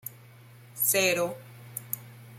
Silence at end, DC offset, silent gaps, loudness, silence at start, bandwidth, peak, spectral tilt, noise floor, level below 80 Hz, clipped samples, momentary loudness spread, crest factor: 0 s; under 0.1%; none; -27 LUFS; 0.05 s; 16.5 kHz; -10 dBFS; -2 dB/octave; -52 dBFS; -74 dBFS; under 0.1%; 21 LU; 22 dB